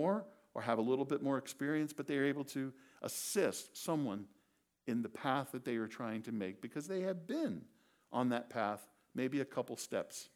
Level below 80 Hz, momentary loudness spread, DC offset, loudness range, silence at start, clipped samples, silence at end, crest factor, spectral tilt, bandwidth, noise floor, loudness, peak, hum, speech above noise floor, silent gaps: -88 dBFS; 9 LU; under 0.1%; 3 LU; 0 s; under 0.1%; 0.1 s; 20 dB; -5 dB/octave; 18.5 kHz; -77 dBFS; -39 LUFS; -18 dBFS; none; 38 dB; none